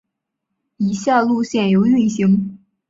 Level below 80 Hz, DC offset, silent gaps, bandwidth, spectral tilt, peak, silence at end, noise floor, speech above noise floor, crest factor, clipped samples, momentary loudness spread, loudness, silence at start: -58 dBFS; under 0.1%; none; 7.8 kHz; -6.5 dB/octave; -2 dBFS; 0.35 s; -77 dBFS; 62 dB; 16 dB; under 0.1%; 8 LU; -17 LUFS; 0.8 s